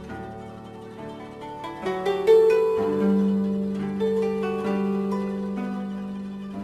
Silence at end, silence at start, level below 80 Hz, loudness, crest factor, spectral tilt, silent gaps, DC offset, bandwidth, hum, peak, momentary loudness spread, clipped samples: 0 s; 0 s; -56 dBFS; -24 LUFS; 18 dB; -8 dB/octave; none; under 0.1%; 13 kHz; none; -8 dBFS; 19 LU; under 0.1%